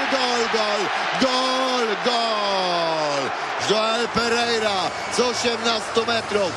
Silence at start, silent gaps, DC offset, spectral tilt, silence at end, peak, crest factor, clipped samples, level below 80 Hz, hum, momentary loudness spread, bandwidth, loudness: 0 s; none; under 0.1%; -2.5 dB/octave; 0 s; -6 dBFS; 14 dB; under 0.1%; -56 dBFS; none; 3 LU; 12 kHz; -21 LUFS